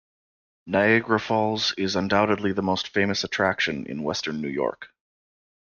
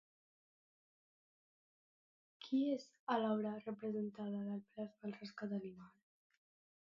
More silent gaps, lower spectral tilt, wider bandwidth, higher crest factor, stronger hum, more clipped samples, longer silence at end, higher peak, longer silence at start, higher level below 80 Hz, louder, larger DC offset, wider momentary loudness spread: second, none vs 2.99-3.07 s; about the same, -4.5 dB/octave vs -5.5 dB/octave; about the same, 7.2 kHz vs 7.2 kHz; about the same, 18 dB vs 22 dB; neither; neither; second, 0.8 s vs 0.95 s; first, -8 dBFS vs -24 dBFS; second, 0.65 s vs 2.4 s; first, -60 dBFS vs under -90 dBFS; first, -24 LUFS vs -43 LUFS; neither; second, 8 LU vs 12 LU